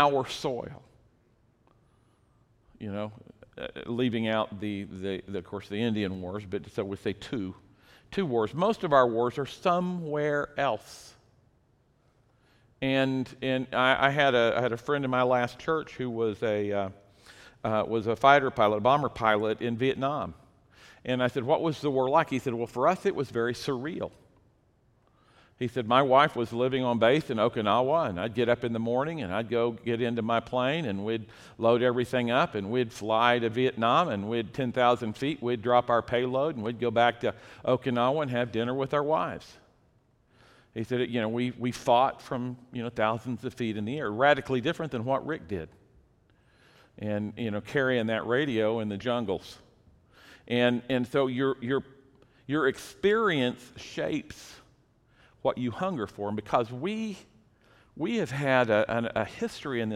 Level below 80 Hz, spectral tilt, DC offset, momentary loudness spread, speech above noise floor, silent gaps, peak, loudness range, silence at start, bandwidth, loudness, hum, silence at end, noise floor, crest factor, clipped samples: -62 dBFS; -6 dB/octave; under 0.1%; 12 LU; 39 dB; none; -6 dBFS; 7 LU; 0 s; 14.5 kHz; -28 LUFS; none; 0 s; -66 dBFS; 24 dB; under 0.1%